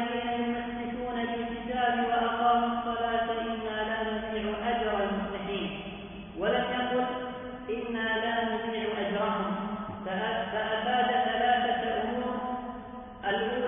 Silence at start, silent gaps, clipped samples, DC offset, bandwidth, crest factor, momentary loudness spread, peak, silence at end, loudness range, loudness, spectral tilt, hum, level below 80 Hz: 0 s; none; under 0.1%; under 0.1%; 3.7 kHz; 16 dB; 10 LU; -14 dBFS; 0 s; 3 LU; -30 LUFS; -9 dB/octave; none; -54 dBFS